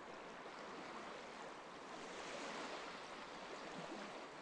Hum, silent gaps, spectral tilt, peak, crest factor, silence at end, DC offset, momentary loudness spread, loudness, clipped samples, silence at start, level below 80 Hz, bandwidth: none; none; -3 dB/octave; -36 dBFS; 16 dB; 0 s; under 0.1%; 5 LU; -51 LUFS; under 0.1%; 0 s; -80 dBFS; 11 kHz